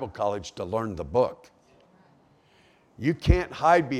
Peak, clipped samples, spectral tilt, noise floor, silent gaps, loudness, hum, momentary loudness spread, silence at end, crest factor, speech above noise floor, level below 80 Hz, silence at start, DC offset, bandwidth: -4 dBFS; under 0.1%; -7 dB/octave; -60 dBFS; none; -26 LUFS; none; 9 LU; 0 s; 24 dB; 35 dB; -38 dBFS; 0 s; under 0.1%; 12 kHz